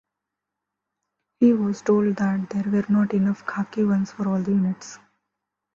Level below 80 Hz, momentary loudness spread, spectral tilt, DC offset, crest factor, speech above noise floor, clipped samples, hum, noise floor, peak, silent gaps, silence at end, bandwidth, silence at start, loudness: -64 dBFS; 8 LU; -8 dB/octave; under 0.1%; 16 dB; 63 dB; under 0.1%; 50 Hz at -40 dBFS; -84 dBFS; -6 dBFS; none; 0.8 s; 7.4 kHz; 1.4 s; -22 LUFS